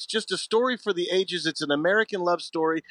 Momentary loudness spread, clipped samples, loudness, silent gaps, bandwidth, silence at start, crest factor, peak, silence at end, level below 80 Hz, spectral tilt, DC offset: 5 LU; under 0.1%; -25 LUFS; none; 11 kHz; 0 s; 16 dB; -8 dBFS; 0.1 s; -84 dBFS; -3.5 dB/octave; under 0.1%